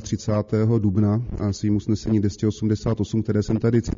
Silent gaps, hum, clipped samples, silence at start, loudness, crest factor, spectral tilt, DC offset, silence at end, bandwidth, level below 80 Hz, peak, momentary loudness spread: none; none; under 0.1%; 0 s; -22 LUFS; 14 dB; -9 dB/octave; under 0.1%; 0.05 s; 7.4 kHz; -40 dBFS; -8 dBFS; 4 LU